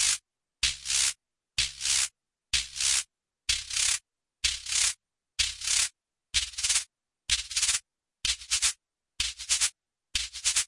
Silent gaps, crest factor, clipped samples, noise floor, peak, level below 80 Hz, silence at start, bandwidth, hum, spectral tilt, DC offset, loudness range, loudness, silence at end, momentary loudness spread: none; 20 dB; under 0.1%; -48 dBFS; -10 dBFS; -52 dBFS; 0 s; 12 kHz; none; 3 dB/octave; under 0.1%; 1 LU; -27 LUFS; 0 s; 7 LU